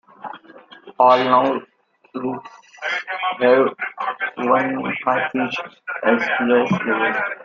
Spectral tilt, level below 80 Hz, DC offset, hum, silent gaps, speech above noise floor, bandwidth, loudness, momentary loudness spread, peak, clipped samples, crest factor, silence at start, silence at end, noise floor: -6 dB/octave; -66 dBFS; under 0.1%; none; none; 26 dB; 7.2 kHz; -19 LUFS; 15 LU; -2 dBFS; under 0.1%; 18 dB; 0.2 s; 0 s; -45 dBFS